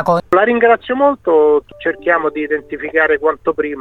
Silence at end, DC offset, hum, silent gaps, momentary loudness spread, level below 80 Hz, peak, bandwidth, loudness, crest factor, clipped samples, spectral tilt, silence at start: 0 s; under 0.1%; none; none; 8 LU; -48 dBFS; 0 dBFS; 6 kHz; -14 LUFS; 14 dB; under 0.1%; -7 dB/octave; 0 s